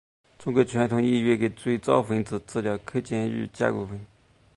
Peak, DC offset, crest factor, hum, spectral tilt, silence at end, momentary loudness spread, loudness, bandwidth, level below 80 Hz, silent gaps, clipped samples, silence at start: -6 dBFS; under 0.1%; 20 dB; none; -7 dB/octave; 0.5 s; 8 LU; -26 LUFS; 11.5 kHz; -58 dBFS; none; under 0.1%; 0.4 s